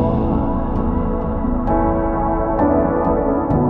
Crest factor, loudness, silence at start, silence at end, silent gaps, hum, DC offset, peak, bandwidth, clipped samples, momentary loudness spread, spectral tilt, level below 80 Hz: 12 dB; -18 LUFS; 0 s; 0 s; none; none; under 0.1%; -6 dBFS; 3.9 kHz; under 0.1%; 5 LU; -12 dB/octave; -24 dBFS